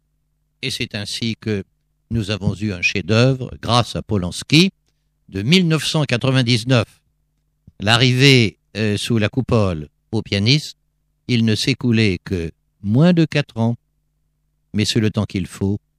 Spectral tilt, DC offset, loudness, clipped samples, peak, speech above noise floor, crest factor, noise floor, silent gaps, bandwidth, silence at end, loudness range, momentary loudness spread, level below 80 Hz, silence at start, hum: -5.5 dB/octave; under 0.1%; -18 LUFS; under 0.1%; 0 dBFS; 49 dB; 18 dB; -67 dBFS; none; 14.5 kHz; 0.2 s; 3 LU; 12 LU; -46 dBFS; 0.6 s; none